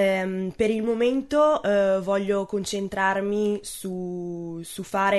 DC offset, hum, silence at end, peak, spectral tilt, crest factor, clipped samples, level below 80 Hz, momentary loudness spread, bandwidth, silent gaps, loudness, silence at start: under 0.1%; none; 0 s; -10 dBFS; -5 dB/octave; 14 dB; under 0.1%; -54 dBFS; 11 LU; 12.5 kHz; none; -25 LUFS; 0 s